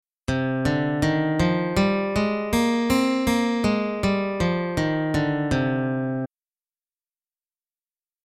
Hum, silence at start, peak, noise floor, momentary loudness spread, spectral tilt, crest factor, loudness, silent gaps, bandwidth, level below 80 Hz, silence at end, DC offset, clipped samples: none; 0.3 s; -8 dBFS; under -90 dBFS; 4 LU; -6 dB/octave; 16 dB; -23 LUFS; none; 16 kHz; -42 dBFS; 2 s; under 0.1%; under 0.1%